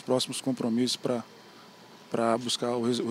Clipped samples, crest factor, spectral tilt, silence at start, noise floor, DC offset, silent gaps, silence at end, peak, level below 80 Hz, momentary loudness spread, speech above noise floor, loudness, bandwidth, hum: under 0.1%; 18 dB; -4 dB/octave; 0.05 s; -51 dBFS; under 0.1%; none; 0 s; -12 dBFS; -78 dBFS; 7 LU; 23 dB; -29 LUFS; 16 kHz; none